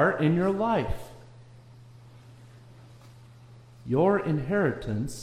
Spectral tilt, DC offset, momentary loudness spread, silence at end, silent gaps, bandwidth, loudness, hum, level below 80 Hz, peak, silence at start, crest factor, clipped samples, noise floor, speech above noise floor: -7.5 dB/octave; under 0.1%; 14 LU; 0 s; none; 14.5 kHz; -26 LUFS; none; -48 dBFS; -12 dBFS; 0 s; 18 dB; under 0.1%; -50 dBFS; 25 dB